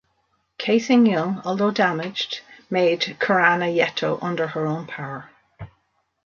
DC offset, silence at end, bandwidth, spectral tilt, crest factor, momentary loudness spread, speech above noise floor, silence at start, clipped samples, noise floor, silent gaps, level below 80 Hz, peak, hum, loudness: under 0.1%; 0.6 s; 7.2 kHz; -5.5 dB/octave; 20 dB; 13 LU; 48 dB; 0.6 s; under 0.1%; -69 dBFS; none; -64 dBFS; -2 dBFS; none; -21 LUFS